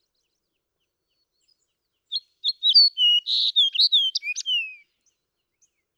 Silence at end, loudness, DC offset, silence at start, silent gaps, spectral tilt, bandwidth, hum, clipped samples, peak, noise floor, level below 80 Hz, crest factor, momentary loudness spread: 1.2 s; -18 LUFS; under 0.1%; 2.1 s; none; 8 dB/octave; 19 kHz; none; under 0.1%; -8 dBFS; -79 dBFS; under -90 dBFS; 18 dB; 17 LU